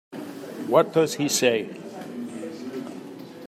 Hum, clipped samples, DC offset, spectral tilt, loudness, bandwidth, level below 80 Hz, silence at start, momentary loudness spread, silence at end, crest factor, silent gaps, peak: none; under 0.1%; under 0.1%; -3.5 dB/octave; -24 LUFS; 15.5 kHz; -76 dBFS; 0.1 s; 17 LU; 0 s; 20 dB; none; -6 dBFS